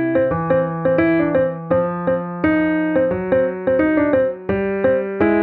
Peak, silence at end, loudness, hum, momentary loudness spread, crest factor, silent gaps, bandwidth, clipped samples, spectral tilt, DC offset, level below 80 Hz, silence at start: -2 dBFS; 0 s; -18 LUFS; none; 4 LU; 16 dB; none; 4.3 kHz; under 0.1%; -11 dB/octave; under 0.1%; -46 dBFS; 0 s